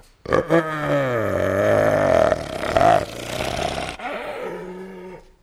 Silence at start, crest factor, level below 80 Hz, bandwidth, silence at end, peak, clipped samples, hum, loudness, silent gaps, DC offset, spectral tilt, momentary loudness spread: 0.25 s; 18 dB; -44 dBFS; 15.5 kHz; 0.25 s; -4 dBFS; under 0.1%; none; -21 LUFS; none; under 0.1%; -5.5 dB/octave; 16 LU